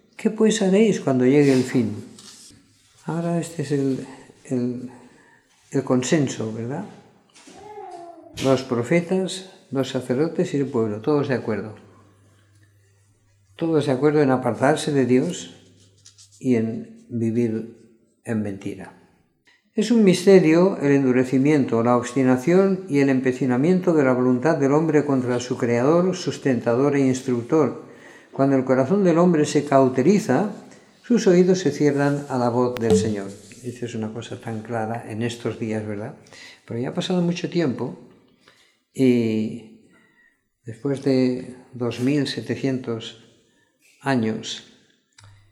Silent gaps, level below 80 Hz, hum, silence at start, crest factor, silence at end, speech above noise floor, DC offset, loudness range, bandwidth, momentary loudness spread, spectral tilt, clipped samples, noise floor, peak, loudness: none; -66 dBFS; none; 0.2 s; 20 dB; 0.9 s; 41 dB; under 0.1%; 8 LU; 13 kHz; 17 LU; -6.5 dB/octave; under 0.1%; -62 dBFS; -2 dBFS; -21 LUFS